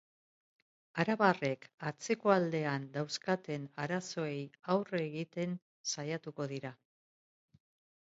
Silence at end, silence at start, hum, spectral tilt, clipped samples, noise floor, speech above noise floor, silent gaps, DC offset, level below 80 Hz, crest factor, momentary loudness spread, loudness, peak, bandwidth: 1.25 s; 0.95 s; none; -4.5 dB/octave; under 0.1%; under -90 dBFS; over 55 dB; 1.74-1.78 s, 5.62-5.84 s; under 0.1%; -80 dBFS; 24 dB; 12 LU; -36 LUFS; -12 dBFS; 7.6 kHz